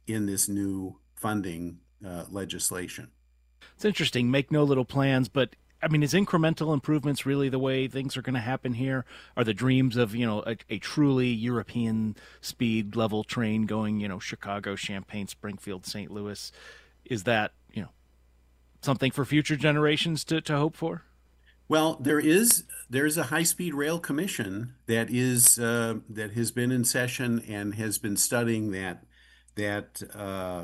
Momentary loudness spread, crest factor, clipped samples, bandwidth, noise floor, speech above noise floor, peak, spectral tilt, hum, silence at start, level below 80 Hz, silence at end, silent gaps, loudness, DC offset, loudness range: 13 LU; 24 dB; under 0.1%; 16 kHz; -61 dBFS; 34 dB; -4 dBFS; -4 dB/octave; none; 0.05 s; -60 dBFS; 0 s; none; -27 LUFS; under 0.1%; 8 LU